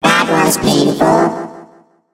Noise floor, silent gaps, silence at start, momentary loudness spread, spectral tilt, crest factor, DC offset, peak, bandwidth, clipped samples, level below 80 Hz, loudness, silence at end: -45 dBFS; none; 0 s; 11 LU; -4 dB/octave; 14 dB; under 0.1%; 0 dBFS; 16.5 kHz; under 0.1%; -44 dBFS; -12 LUFS; 0.5 s